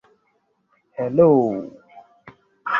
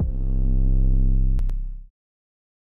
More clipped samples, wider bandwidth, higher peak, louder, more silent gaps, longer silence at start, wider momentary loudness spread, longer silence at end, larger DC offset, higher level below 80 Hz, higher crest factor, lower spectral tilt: neither; first, 5.6 kHz vs 1 kHz; first, -2 dBFS vs -12 dBFS; first, -18 LUFS vs -25 LUFS; neither; first, 1 s vs 0 s; first, 22 LU vs 13 LU; second, 0 s vs 0.95 s; neither; second, -60 dBFS vs -20 dBFS; first, 20 dB vs 10 dB; second, -9.5 dB/octave vs -11 dB/octave